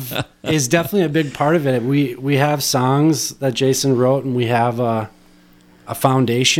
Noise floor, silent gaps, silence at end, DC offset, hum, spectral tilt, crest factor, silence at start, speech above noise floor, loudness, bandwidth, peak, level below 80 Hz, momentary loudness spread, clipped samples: -49 dBFS; none; 0 s; under 0.1%; none; -5 dB/octave; 16 dB; 0 s; 32 dB; -17 LUFS; 17 kHz; 0 dBFS; -54 dBFS; 5 LU; under 0.1%